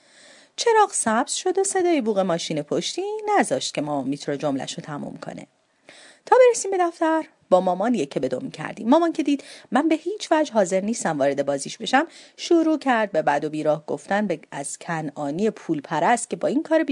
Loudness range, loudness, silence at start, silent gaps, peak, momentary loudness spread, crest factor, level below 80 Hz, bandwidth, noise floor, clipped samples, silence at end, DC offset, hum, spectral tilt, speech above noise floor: 3 LU; -22 LUFS; 0.6 s; none; -2 dBFS; 10 LU; 20 dB; -74 dBFS; 11 kHz; -51 dBFS; under 0.1%; 0 s; under 0.1%; none; -4 dB/octave; 29 dB